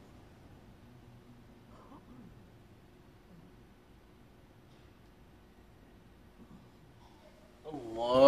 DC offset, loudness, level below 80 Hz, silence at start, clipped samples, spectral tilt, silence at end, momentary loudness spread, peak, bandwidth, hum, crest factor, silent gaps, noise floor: under 0.1%; -45 LUFS; -64 dBFS; 7.65 s; under 0.1%; -6.5 dB/octave; 0 s; 13 LU; -10 dBFS; 12.5 kHz; none; 28 dB; none; -59 dBFS